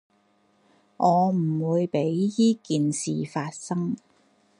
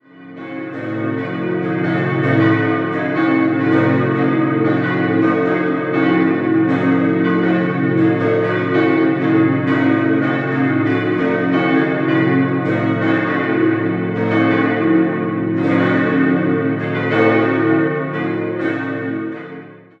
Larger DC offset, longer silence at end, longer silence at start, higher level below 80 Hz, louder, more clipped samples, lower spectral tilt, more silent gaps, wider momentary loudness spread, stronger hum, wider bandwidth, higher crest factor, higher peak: neither; first, 0.6 s vs 0.25 s; first, 1 s vs 0.15 s; second, -72 dBFS vs -60 dBFS; second, -25 LUFS vs -16 LUFS; neither; second, -6.5 dB/octave vs -9 dB/octave; neither; about the same, 9 LU vs 7 LU; neither; first, 11 kHz vs 5.6 kHz; about the same, 18 dB vs 14 dB; second, -8 dBFS vs -2 dBFS